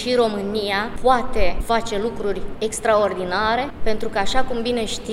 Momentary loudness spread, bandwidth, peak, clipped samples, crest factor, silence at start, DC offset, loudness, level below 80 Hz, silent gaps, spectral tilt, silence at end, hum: 7 LU; 13.5 kHz; -2 dBFS; under 0.1%; 18 dB; 0 s; under 0.1%; -22 LUFS; -32 dBFS; none; -4 dB/octave; 0 s; none